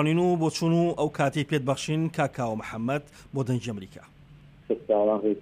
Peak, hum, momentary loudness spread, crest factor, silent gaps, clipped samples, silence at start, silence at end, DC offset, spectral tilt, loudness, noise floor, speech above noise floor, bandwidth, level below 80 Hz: -12 dBFS; none; 9 LU; 16 dB; none; under 0.1%; 0 s; 0 s; under 0.1%; -6.5 dB/octave; -27 LUFS; -51 dBFS; 25 dB; 14.5 kHz; -60 dBFS